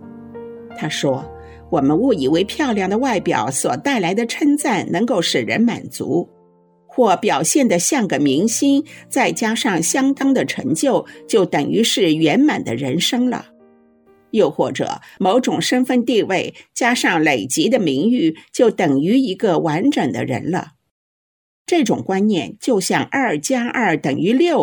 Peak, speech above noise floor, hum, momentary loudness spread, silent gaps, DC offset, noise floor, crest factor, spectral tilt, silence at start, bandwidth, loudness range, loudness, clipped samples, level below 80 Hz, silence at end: 0 dBFS; 36 dB; none; 7 LU; 20.91-21.65 s; under 0.1%; -53 dBFS; 16 dB; -4 dB/octave; 0 s; 19 kHz; 3 LU; -17 LUFS; under 0.1%; -56 dBFS; 0 s